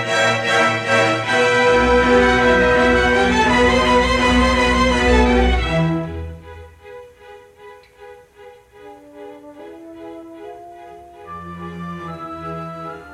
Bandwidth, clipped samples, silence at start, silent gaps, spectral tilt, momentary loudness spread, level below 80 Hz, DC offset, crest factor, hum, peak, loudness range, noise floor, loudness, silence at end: 12.5 kHz; under 0.1%; 0 s; none; -5 dB/octave; 23 LU; -28 dBFS; under 0.1%; 16 dB; none; -2 dBFS; 22 LU; -44 dBFS; -15 LUFS; 0 s